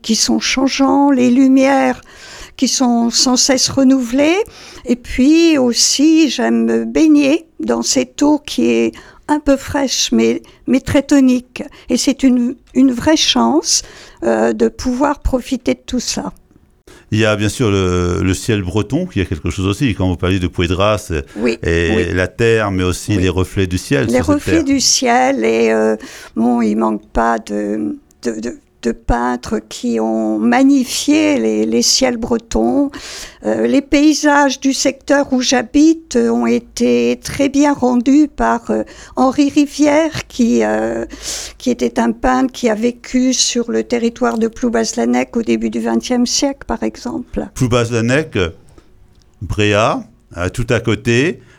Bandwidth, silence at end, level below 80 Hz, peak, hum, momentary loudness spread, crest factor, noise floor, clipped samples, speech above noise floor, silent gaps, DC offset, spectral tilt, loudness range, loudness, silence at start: 15.5 kHz; 0.2 s; -36 dBFS; 0 dBFS; none; 10 LU; 14 dB; -46 dBFS; under 0.1%; 32 dB; none; under 0.1%; -4 dB/octave; 5 LU; -14 LUFS; 0.05 s